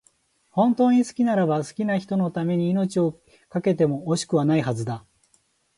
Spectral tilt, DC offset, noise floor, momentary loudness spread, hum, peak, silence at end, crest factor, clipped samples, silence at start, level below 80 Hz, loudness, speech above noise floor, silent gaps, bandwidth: -7 dB/octave; under 0.1%; -65 dBFS; 9 LU; none; -8 dBFS; 0.8 s; 14 dB; under 0.1%; 0.55 s; -64 dBFS; -23 LUFS; 43 dB; none; 11.5 kHz